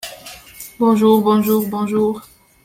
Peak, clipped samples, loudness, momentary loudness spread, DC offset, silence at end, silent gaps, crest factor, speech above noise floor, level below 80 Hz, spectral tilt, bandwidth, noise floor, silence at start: -2 dBFS; under 0.1%; -16 LUFS; 22 LU; under 0.1%; 0.45 s; none; 16 dB; 23 dB; -56 dBFS; -6.5 dB/octave; 16.5 kHz; -38 dBFS; 0.05 s